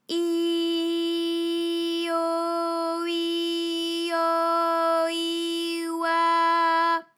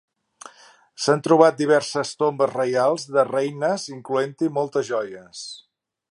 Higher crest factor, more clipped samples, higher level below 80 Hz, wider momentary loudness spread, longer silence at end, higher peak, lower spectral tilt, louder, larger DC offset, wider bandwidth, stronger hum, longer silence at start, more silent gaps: second, 12 dB vs 22 dB; neither; second, under -90 dBFS vs -74 dBFS; second, 6 LU vs 18 LU; second, 0.15 s vs 0.55 s; second, -12 dBFS vs 0 dBFS; second, -1 dB/octave vs -5 dB/octave; second, -25 LUFS vs -21 LUFS; neither; first, 16 kHz vs 11.5 kHz; neither; second, 0.1 s vs 0.45 s; neither